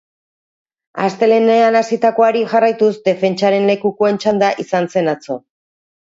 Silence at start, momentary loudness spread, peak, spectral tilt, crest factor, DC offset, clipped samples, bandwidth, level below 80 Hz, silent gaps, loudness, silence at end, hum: 0.95 s; 9 LU; 0 dBFS; -6 dB/octave; 14 dB; under 0.1%; under 0.1%; 7.8 kHz; -66 dBFS; none; -15 LUFS; 0.75 s; none